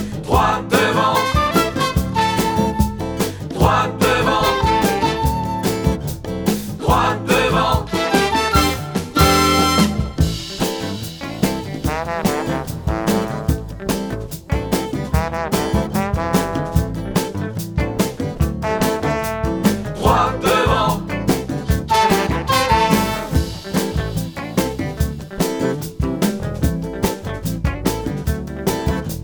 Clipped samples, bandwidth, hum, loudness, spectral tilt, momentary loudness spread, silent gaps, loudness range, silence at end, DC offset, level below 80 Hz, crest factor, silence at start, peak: under 0.1%; over 20 kHz; none; -19 LUFS; -5 dB/octave; 8 LU; none; 5 LU; 0 s; under 0.1%; -28 dBFS; 18 dB; 0 s; 0 dBFS